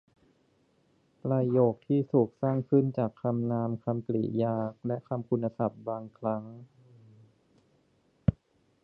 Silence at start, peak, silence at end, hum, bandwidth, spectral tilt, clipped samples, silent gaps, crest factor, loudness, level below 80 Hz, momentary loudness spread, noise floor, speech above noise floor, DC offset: 1.25 s; -10 dBFS; 0.5 s; none; 4.4 kHz; -12 dB/octave; under 0.1%; none; 22 dB; -30 LUFS; -56 dBFS; 10 LU; -69 dBFS; 40 dB; under 0.1%